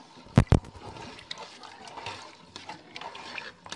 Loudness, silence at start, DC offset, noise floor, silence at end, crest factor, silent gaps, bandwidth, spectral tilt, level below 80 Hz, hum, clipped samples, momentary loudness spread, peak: -30 LUFS; 0 s; under 0.1%; -47 dBFS; 0 s; 28 dB; none; 11 kHz; -6.5 dB/octave; -40 dBFS; none; under 0.1%; 20 LU; -4 dBFS